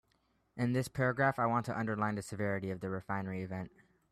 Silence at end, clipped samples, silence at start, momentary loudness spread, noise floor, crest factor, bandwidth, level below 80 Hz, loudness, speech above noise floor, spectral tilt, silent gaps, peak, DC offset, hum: 0.45 s; under 0.1%; 0.55 s; 11 LU; -75 dBFS; 20 dB; 14 kHz; -68 dBFS; -35 LUFS; 41 dB; -7 dB/octave; none; -16 dBFS; under 0.1%; none